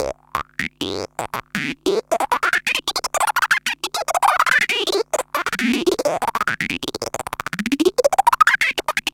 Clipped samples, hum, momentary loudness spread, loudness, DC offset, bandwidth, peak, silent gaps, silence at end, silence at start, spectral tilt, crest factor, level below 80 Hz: under 0.1%; none; 11 LU; -19 LUFS; under 0.1%; 17 kHz; 0 dBFS; none; 0.05 s; 0 s; -2.5 dB/octave; 20 dB; -52 dBFS